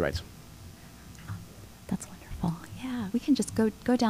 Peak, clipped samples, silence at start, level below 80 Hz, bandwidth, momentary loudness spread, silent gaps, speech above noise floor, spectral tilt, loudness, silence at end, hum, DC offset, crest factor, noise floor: -12 dBFS; under 0.1%; 0 s; -50 dBFS; 16 kHz; 21 LU; none; 21 dB; -5.5 dB/octave; -32 LUFS; 0 s; none; under 0.1%; 18 dB; -48 dBFS